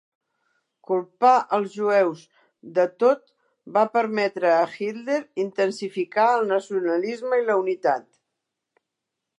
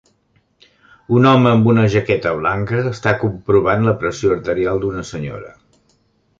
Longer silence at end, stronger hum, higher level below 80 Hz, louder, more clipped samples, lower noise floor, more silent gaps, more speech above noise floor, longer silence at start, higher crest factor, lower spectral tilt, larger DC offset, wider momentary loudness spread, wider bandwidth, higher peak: first, 1.4 s vs 0.9 s; neither; second, -82 dBFS vs -44 dBFS; second, -23 LUFS vs -16 LUFS; neither; first, -83 dBFS vs -60 dBFS; neither; first, 61 dB vs 45 dB; second, 0.9 s vs 1.1 s; about the same, 18 dB vs 16 dB; second, -5.5 dB/octave vs -7.5 dB/octave; neither; second, 8 LU vs 13 LU; first, 11 kHz vs 7.6 kHz; second, -6 dBFS vs -2 dBFS